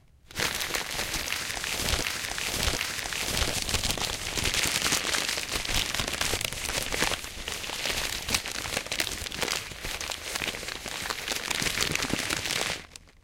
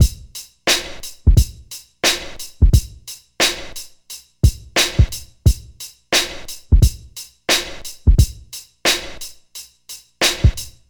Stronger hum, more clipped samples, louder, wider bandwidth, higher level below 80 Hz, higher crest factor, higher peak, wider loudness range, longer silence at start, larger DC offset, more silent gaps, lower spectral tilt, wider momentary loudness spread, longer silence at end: neither; neither; second, -28 LUFS vs -18 LUFS; second, 17 kHz vs over 20 kHz; second, -42 dBFS vs -22 dBFS; about the same, 22 dB vs 18 dB; second, -8 dBFS vs 0 dBFS; about the same, 3 LU vs 1 LU; first, 0.3 s vs 0 s; neither; neither; second, -1.5 dB/octave vs -3.5 dB/octave; second, 7 LU vs 19 LU; about the same, 0.15 s vs 0.2 s